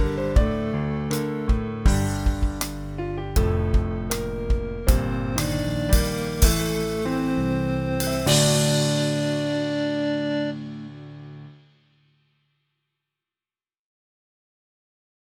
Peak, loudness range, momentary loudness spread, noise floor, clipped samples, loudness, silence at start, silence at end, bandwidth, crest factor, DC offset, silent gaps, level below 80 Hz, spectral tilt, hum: -4 dBFS; 8 LU; 10 LU; under -90 dBFS; under 0.1%; -24 LUFS; 0 s; 3.65 s; over 20 kHz; 20 dB; under 0.1%; none; -28 dBFS; -5 dB/octave; none